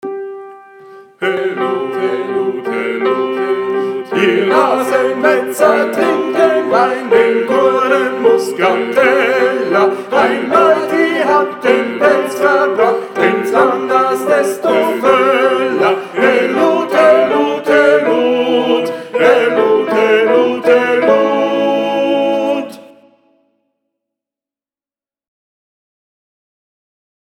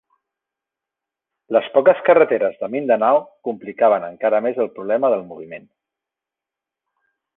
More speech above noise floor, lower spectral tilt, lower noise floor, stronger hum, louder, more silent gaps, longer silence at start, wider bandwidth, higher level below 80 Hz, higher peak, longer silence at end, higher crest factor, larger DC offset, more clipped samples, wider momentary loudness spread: first, over 78 dB vs 69 dB; second, -4.5 dB/octave vs -8.5 dB/octave; about the same, under -90 dBFS vs -87 dBFS; neither; first, -12 LUFS vs -18 LUFS; neither; second, 0.05 s vs 1.5 s; first, 17 kHz vs 3.9 kHz; first, -62 dBFS vs -70 dBFS; about the same, 0 dBFS vs -2 dBFS; first, 4.45 s vs 1.8 s; about the same, 14 dB vs 18 dB; neither; neither; second, 7 LU vs 15 LU